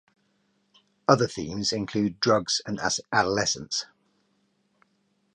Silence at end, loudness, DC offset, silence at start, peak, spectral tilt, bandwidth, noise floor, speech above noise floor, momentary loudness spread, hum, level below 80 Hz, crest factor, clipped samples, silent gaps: 1.5 s; -25 LUFS; under 0.1%; 1.1 s; -4 dBFS; -3.5 dB/octave; 10.5 kHz; -70 dBFS; 45 dB; 8 LU; none; -60 dBFS; 24 dB; under 0.1%; none